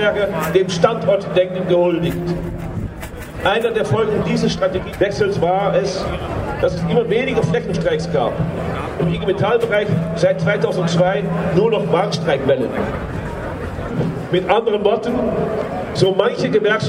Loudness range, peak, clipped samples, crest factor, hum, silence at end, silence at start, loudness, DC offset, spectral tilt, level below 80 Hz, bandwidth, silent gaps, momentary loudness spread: 2 LU; 0 dBFS; under 0.1%; 18 dB; none; 0 s; 0 s; -18 LUFS; under 0.1%; -6.5 dB/octave; -38 dBFS; 16 kHz; none; 8 LU